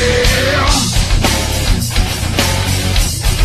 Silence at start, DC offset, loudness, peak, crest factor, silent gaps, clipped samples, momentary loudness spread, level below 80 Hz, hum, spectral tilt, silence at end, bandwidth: 0 s; under 0.1%; -14 LUFS; 0 dBFS; 12 dB; none; under 0.1%; 4 LU; -18 dBFS; none; -3.5 dB/octave; 0 s; 14.5 kHz